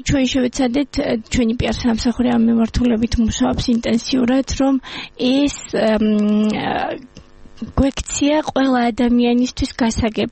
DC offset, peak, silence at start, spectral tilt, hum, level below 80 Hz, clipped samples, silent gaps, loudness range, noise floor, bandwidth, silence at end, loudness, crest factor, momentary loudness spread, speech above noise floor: under 0.1%; -4 dBFS; 0 s; -5 dB/octave; none; -32 dBFS; under 0.1%; none; 2 LU; -40 dBFS; 8.8 kHz; 0 s; -18 LUFS; 14 dB; 5 LU; 23 dB